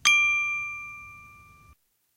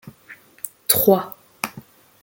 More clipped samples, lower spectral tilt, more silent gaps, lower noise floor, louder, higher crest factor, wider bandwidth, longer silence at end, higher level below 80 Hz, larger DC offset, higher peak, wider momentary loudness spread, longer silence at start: neither; second, 2.5 dB/octave vs -3.5 dB/octave; neither; first, -60 dBFS vs -47 dBFS; second, -23 LUFS vs -19 LUFS; about the same, 22 dB vs 24 dB; about the same, 16 kHz vs 17 kHz; first, 0.9 s vs 0.4 s; about the same, -62 dBFS vs -60 dBFS; neither; second, -6 dBFS vs 0 dBFS; first, 23 LU vs 19 LU; about the same, 0.05 s vs 0.05 s